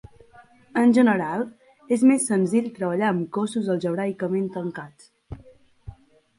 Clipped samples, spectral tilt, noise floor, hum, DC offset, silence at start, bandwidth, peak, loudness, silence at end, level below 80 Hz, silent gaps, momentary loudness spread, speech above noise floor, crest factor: under 0.1%; -6 dB/octave; -52 dBFS; none; under 0.1%; 0.75 s; 11.5 kHz; -6 dBFS; -23 LUFS; 0.45 s; -56 dBFS; none; 21 LU; 30 dB; 18 dB